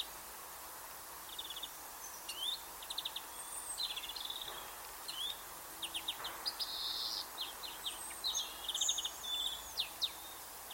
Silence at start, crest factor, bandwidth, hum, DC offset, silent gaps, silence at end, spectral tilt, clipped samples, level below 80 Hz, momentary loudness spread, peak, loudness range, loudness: 0 s; 22 dB; 16.5 kHz; none; under 0.1%; none; 0 s; 1 dB/octave; under 0.1%; -68 dBFS; 10 LU; -22 dBFS; 5 LU; -40 LUFS